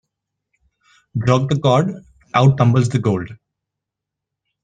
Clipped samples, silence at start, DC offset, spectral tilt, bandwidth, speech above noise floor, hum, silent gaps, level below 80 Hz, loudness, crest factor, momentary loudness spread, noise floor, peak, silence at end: under 0.1%; 1.15 s; under 0.1%; -7.5 dB/octave; 9.2 kHz; 68 dB; none; none; -52 dBFS; -17 LUFS; 18 dB; 13 LU; -83 dBFS; -2 dBFS; 1.3 s